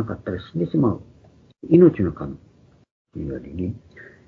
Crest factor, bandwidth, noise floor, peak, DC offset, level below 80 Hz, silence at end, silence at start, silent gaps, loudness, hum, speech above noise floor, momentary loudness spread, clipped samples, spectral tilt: 20 dB; 4.4 kHz; -53 dBFS; -2 dBFS; under 0.1%; -48 dBFS; 0.25 s; 0 s; 2.91-3.05 s; -21 LUFS; none; 32 dB; 25 LU; under 0.1%; -11 dB/octave